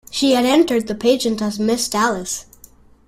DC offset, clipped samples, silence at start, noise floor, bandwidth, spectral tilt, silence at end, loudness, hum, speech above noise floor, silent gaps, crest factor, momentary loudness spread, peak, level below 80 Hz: under 0.1%; under 0.1%; 0.1 s; -47 dBFS; 16 kHz; -3.5 dB/octave; 0.65 s; -18 LUFS; none; 30 dB; none; 16 dB; 9 LU; -2 dBFS; -52 dBFS